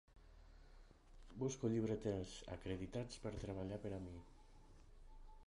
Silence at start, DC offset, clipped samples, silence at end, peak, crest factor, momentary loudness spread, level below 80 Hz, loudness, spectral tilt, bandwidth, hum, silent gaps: 0.1 s; under 0.1%; under 0.1%; 0 s; -28 dBFS; 20 dB; 26 LU; -60 dBFS; -46 LUFS; -6.5 dB/octave; 11 kHz; none; none